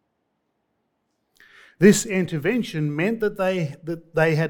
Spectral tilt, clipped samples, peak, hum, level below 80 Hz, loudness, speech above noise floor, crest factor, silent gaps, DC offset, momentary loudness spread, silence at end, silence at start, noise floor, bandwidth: -5.5 dB/octave; under 0.1%; -2 dBFS; none; -56 dBFS; -22 LUFS; 53 dB; 22 dB; none; under 0.1%; 11 LU; 0 s; 1.8 s; -74 dBFS; 18.5 kHz